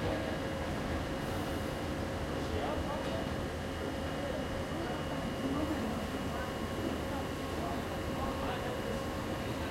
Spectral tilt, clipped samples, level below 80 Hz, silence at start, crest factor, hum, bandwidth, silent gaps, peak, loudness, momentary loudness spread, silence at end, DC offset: -5.5 dB/octave; under 0.1%; -46 dBFS; 0 s; 14 dB; none; 16 kHz; none; -22 dBFS; -37 LUFS; 2 LU; 0 s; under 0.1%